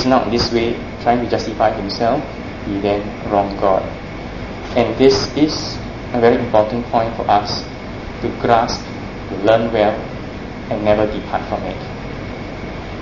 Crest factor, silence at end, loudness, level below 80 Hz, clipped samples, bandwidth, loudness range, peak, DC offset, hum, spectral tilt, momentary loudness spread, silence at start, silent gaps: 18 dB; 0 s; -18 LUFS; -36 dBFS; under 0.1%; 7.4 kHz; 3 LU; 0 dBFS; 0.4%; none; -5.5 dB/octave; 14 LU; 0 s; none